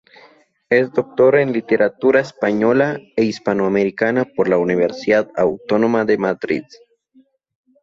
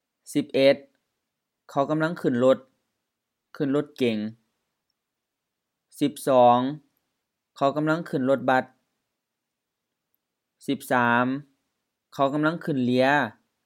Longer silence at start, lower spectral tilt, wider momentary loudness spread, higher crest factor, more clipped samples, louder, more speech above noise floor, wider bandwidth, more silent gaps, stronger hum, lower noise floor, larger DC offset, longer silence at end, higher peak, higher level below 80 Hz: first, 0.7 s vs 0.3 s; about the same, -7 dB/octave vs -6 dB/octave; second, 5 LU vs 11 LU; about the same, 16 dB vs 20 dB; neither; first, -17 LUFS vs -24 LUFS; second, 39 dB vs 61 dB; second, 7.6 kHz vs 16.5 kHz; neither; neither; second, -55 dBFS vs -84 dBFS; neither; first, 1.2 s vs 0.35 s; first, -2 dBFS vs -6 dBFS; first, -58 dBFS vs -82 dBFS